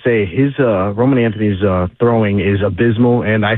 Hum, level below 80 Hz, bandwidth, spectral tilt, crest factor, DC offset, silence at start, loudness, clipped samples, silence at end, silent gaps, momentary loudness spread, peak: none; -42 dBFS; 4.1 kHz; -11.5 dB/octave; 12 dB; under 0.1%; 0.05 s; -14 LUFS; under 0.1%; 0 s; none; 3 LU; -2 dBFS